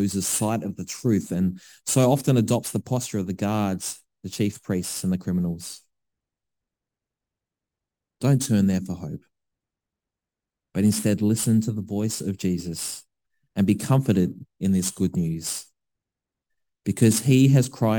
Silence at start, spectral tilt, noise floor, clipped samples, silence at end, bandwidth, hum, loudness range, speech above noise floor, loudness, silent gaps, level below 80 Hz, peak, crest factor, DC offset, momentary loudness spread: 0 s; -6 dB/octave; -88 dBFS; under 0.1%; 0 s; 19 kHz; none; 6 LU; 66 dB; -24 LUFS; none; -58 dBFS; -6 dBFS; 18 dB; under 0.1%; 13 LU